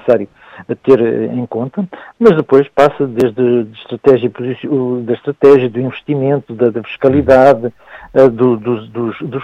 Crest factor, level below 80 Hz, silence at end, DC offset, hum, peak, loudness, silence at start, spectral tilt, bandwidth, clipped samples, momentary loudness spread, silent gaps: 12 dB; -46 dBFS; 0 s; under 0.1%; none; 0 dBFS; -13 LUFS; 0.05 s; -8.5 dB/octave; 8 kHz; under 0.1%; 12 LU; none